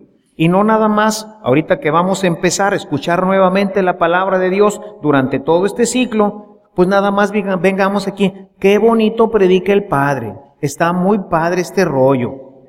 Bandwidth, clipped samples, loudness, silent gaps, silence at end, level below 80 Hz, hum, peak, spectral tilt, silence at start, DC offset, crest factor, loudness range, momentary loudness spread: 16 kHz; under 0.1%; -14 LUFS; none; 0.2 s; -48 dBFS; none; 0 dBFS; -5.5 dB/octave; 0.4 s; under 0.1%; 14 dB; 1 LU; 6 LU